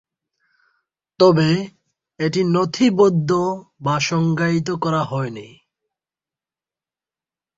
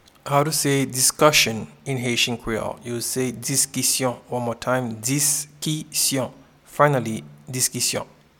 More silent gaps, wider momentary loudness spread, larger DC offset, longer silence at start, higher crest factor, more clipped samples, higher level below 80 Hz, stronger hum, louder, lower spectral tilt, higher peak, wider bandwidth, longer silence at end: neither; about the same, 11 LU vs 12 LU; neither; first, 1.2 s vs 0.25 s; about the same, 18 dB vs 22 dB; neither; second, -58 dBFS vs -52 dBFS; neither; about the same, -19 LUFS vs -21 LUFS; first, -6 dB/octave vs -3 dB/octave; about the same, -2 dBFS vs -2 dBFS; second, 7.8 kHz vs 19 kHz; first, 2.1 s vs 0.35 s